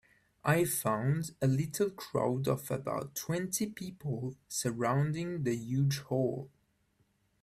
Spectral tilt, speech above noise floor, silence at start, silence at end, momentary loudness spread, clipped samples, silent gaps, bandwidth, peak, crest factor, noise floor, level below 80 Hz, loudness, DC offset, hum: -5.5 dB/octave; 41 dB; 0.45 s; 0.95 s; 7 LU; under 0.1%; none; 16 kHz; -14 dBFS; 18 dB; -74 dBFS; -66 dBFS; -33 LUFS; under 0.1%; none